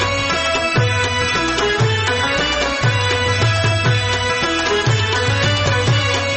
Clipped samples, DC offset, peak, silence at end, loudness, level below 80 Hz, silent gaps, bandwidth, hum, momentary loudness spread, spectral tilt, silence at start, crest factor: under 0.1%; under 0.1%; -4 dBFS; 0 s; -16 LUFS; -36 dBFS; none; 8.8 kHz; none; 1 LU; -4 dB/octave; 0 s; 12 dB